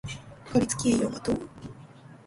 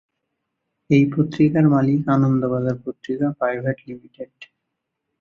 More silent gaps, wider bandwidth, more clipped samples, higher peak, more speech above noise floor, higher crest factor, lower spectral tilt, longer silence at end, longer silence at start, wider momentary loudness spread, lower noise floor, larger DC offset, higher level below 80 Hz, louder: neither; first, 11.5 kHz vs 6.8 kHz; neither; second, -10 dBFS vs -4 dBFS; second, 22 dB vs 60 dB; about the same, 20 dB vs 18 dB; second, -5 dB/octave vs -9.5 dB/octave; second, 0.1 s vs 0.75 s; second, 0.05 s vs 0.9 s; about the same, 20 LU vs 20 LU; second, -49 dBFS vs -79 dBFS; neither; first, -52 dBFS vs -58 dBFS; second, -27 LUFS vs -19 LUFS